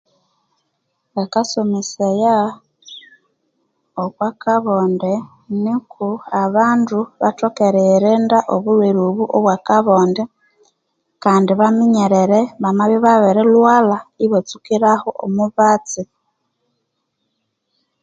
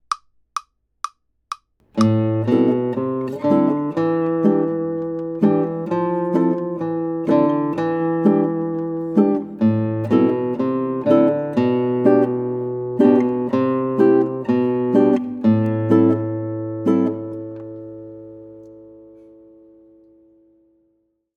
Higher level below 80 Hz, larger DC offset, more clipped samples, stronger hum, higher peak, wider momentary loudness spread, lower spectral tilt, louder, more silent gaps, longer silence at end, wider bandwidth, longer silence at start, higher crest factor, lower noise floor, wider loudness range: about the same, -64 dBFS vs -62 dBFS; neither; neither; neither; about the same, 0 dBFS vs -2 dBFS; second, 12 LU vs 16 LU; second, -6.5 dB/octave vs -9 dB/octave; first, -15 LUFS vs -19 LUFS; neither; second, 2 s vs 2.35 s; second, 7.8 kHz vs 10.5 kHz; first, 1.15 s vs 0.1 s; about the same, 16 dB vs 18 dB; first, -72 dBFS vs -67 dBFS; first, 7 LU vs 4 LU